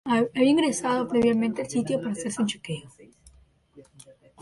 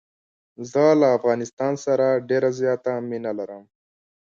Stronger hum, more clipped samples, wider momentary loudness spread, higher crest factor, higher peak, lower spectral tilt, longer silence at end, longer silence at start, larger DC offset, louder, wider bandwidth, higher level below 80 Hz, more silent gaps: neither; neither; about the same, 11 LU vs 12 LU; about the same, 16 dB vs 16 dB; second, -10 dBFS vs -6 dBFS; second, -4.5 dB/octave vs -6.5 dB/octave; second, 0.3 s vs 0.65 s; second, 0.05 s vs 0.6 s; neither; second, -25 LUFS vs -22 LUFS; first, 11.5 kHz vs 7.6 kHz; first, -60 dBFS vs -70 dBFS; second, none vs 1.53-1.57 s